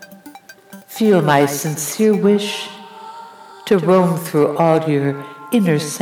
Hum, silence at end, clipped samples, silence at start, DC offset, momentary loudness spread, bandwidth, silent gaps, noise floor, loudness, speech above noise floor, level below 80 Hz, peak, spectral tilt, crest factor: none; 0 s; under 0.1%; 0 s; under 0.1%; 20 LU; over 20 kHz; none; -41 dBFS; -16 LUFS; 26 dB; -64 dBFS; -2 dBFS; -5.5 dB/octave; 14 dB